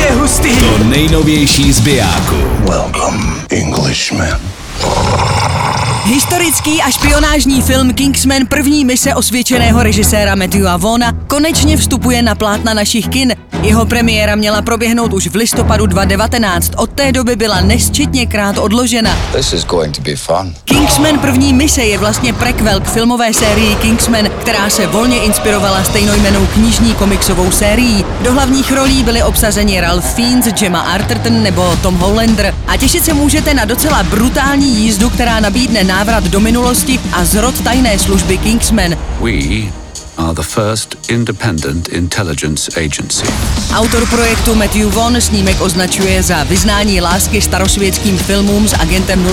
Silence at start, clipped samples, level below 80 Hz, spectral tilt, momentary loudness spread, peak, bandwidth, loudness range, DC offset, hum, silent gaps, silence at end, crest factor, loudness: 0 s; under 0.1%; -20 dBFS; -4 dB/octave; 5 LU; 0 dBFS; 18.5 kHz; 3 LU; 0.3%; none; none; 0 s; 10 dB; -10 LUFS